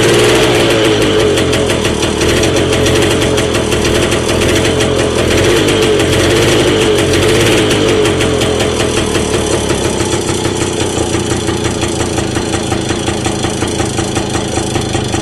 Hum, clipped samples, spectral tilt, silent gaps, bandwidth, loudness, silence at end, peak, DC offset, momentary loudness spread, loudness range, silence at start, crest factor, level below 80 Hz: none; under 0.1%; -4 dB/octave; none; 13.5 kHz; -12 LUFS; 0 s; -2 dBFS; under 0.1%; 6 LU; 5 LU; 0 s; 10 dB; -26 dBFS